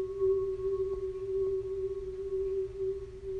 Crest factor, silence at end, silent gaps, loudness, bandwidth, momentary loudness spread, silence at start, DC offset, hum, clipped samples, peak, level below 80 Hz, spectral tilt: 12 dB; 0 s; none; -34 LUFS; 4.7 kHz; 6 LU; 0 s; under 0.1%; none; under 0.1%; -22 dBFS; -50 dBFS; -9 dB/octave